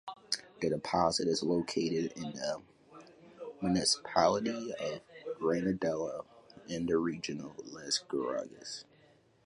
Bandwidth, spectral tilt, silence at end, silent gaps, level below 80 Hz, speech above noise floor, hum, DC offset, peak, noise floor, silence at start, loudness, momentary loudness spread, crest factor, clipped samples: 11.5 kHz; -4 dB/octave; 0.65 s; none; -64 dBFS; 32 dB; none; under 0.1%; -12 dBFS; -65 dBFS; 0.05 s; -34 LUFS; 15 LU; 22 dB; under 0.1%